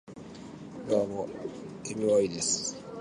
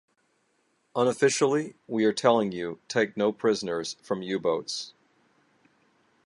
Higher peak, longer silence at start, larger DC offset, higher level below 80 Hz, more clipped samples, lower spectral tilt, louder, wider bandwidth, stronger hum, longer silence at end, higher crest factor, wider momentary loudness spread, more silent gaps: second, -14 dBFS vs -6 dBFS; second, 0.05 s vs 0.95 s; neither; first, -64 dBFS vs -72 dBFS; neither; about the same, -3.5 dB/octave vs -4 dB/octave; second, -30 LUFS vs -27 LUFS; about the same, 11.5 kHz vs 11.5 kHz; neither; second, 0 s vs 1.35 s; about the same, 18 dB vs 22 dB; first, 19 LU vs 11 LU; neither